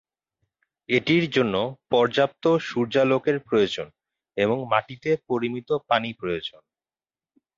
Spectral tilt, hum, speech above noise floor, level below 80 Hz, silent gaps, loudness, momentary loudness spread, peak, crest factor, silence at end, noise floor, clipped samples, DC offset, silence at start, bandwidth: -6 dB/octave; none; over 67 dB; -62 dBFS; none; -24 LUFS; 9 LU; -4 dBFS; 20 dB; 1.1 s; under -90 dBFS; under 0.1%; under 0.1%; 0.9 s; 7.6 kHz